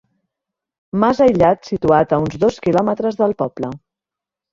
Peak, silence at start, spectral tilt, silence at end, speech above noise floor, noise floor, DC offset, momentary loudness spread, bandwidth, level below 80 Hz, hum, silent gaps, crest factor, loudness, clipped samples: 0 dBFS; 0.95 s; -7.5 dB/octave; 0.75 s; 71 dB; -87 dBFS; under 0.1%; 12 LU; 7.6 kHz; -46 dBFS; none; none; 18 dB; -16 LUFS; under 0.1%